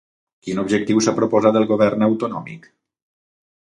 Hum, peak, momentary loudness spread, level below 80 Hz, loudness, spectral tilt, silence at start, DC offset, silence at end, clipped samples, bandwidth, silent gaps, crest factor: none; -2 dBFS; 14 LU; -60 dBFS; -18 LUFS; -5.5 dB/octave; 0.45 s; under 0.1%; 1.05 s; under 0.1%; 11 kHz; none; 18 dB